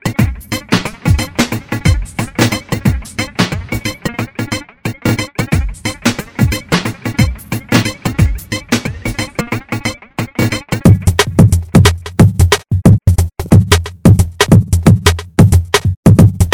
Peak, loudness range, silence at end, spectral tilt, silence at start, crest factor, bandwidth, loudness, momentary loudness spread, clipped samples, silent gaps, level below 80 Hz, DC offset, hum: 0 dBFS; 7 LU; 0 s; -5.5 dB/octave; 0.05 s; 12 dB; over 20 kHz; -13 LUFS; 11 LU; 0.9%; 15.97-16.03 s; -24 dBFS; under 0.1%; none